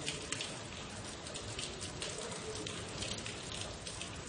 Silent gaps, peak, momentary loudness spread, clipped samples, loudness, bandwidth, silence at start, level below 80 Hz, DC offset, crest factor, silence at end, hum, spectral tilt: none; -18 dBFS; 5 LU; under 0.1%; -41 LUFS; 10.5 kHz; 0 s; -58 dBFS; under 0.1%; 26 dB; 0 s; none; -2.5 dB/octave